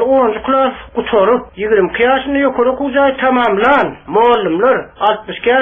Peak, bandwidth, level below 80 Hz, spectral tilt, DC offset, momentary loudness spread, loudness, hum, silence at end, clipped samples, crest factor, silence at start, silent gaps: 0 dBFS; 4 kHz; -42 dBFS; -7.5 dB/octave; under 0.1%; 4 LU; -13 LUFS; none; 0 s; under 0.1%; 12 dB; 0 s; none